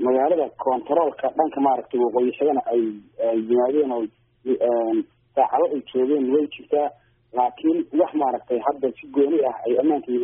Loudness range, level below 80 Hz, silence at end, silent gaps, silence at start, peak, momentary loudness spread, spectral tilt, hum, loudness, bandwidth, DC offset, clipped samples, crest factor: 1 LU; -68 dBFS; 0 s; none; 0 s; -4 dBFS; 7 LU; -2 dB/octave; none; -22 LUFS; 3.7 kHz; under 0.1%; under 0.1%; 16 dB